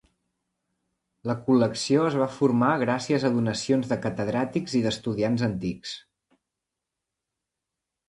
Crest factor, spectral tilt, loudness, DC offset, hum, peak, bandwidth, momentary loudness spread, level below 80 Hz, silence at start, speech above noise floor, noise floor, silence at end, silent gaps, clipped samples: 20 dB; -6 dB/octave; -25 LUFS; under 0.1%; none; -8 dBFS; 11.5 kHz; 9 LU; -60 dBFS; 1.25 s; 61 dB; -86 dBFS; 2.1 s; none; under 0.1%